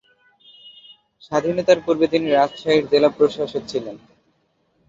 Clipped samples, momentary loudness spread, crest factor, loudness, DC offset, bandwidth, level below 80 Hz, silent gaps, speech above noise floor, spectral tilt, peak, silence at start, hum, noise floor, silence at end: under 0.1%; 10 LU; 18 dB; -19 LUFS; under 0.1%; 7.8 kHz; -60 dBFS; none; 47 dB; -5.5 dB/octave; -2 dBFS; 0.65 s; none; -66 dBFS; 0.9 s